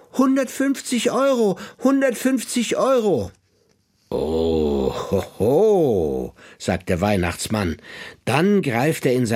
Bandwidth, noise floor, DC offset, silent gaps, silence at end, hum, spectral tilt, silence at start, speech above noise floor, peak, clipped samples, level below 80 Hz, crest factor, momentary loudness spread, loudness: 16.5 kHz; -62 dBFS; under 0.1%; none; 0 s; none; -5.5 dB/octave; 0.15 s; 43 dB; -2 dBFS; under 0.1%; -44 dBFS; 18 dB; 9 LU; -20 LUFS